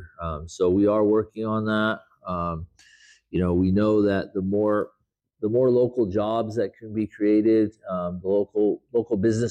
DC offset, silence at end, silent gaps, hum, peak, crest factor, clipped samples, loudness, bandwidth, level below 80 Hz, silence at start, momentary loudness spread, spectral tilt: under 0.1%; 0 s; none; none; -12 dBFS; 12 dB; under 0.1%; -24 LUFS; 9 kHz; -50 dBFS; 0 s; 11 LU; -8 dB/octave